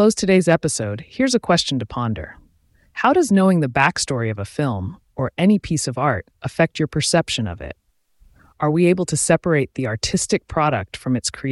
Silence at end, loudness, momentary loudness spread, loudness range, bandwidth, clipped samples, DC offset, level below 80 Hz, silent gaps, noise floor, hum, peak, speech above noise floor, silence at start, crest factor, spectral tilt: 0 s; -19 LUFS; 11 LU; 2 LU; 12 kHz; under 0.1%; under 0.1%; -46 dBFS; none; -57 dBFS; none; -2 dBFS; 38 dB; 0 s; 16 dB; -5 dB/octave